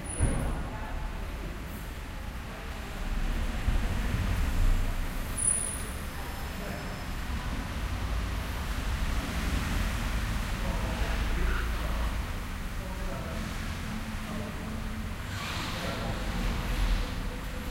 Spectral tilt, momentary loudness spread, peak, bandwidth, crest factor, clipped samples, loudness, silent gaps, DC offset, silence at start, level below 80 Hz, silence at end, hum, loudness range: -4 dB/octave; 7 LU; -14 dBFS; 16 kHz; 18 dB; under 0.1%; -34 LUFS; none; under 0.1%; 0 s; -32 dBFS; 0 s; none; 5 LU